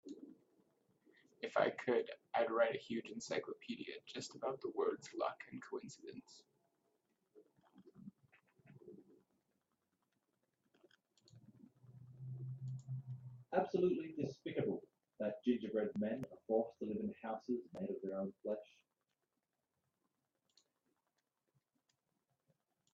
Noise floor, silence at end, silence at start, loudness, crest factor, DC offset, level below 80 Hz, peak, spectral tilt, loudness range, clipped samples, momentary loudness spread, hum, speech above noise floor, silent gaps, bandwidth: -89 dBFS; 4.3 s; 0.05 s; -42 LUFS; 24 dB; under 0.1%; -86 dBFS; -22 dBFS; -5.5 dB/octave; 15 LU; under 0.1%; 18 LU; none; 48 dB; none; 7.6 kHz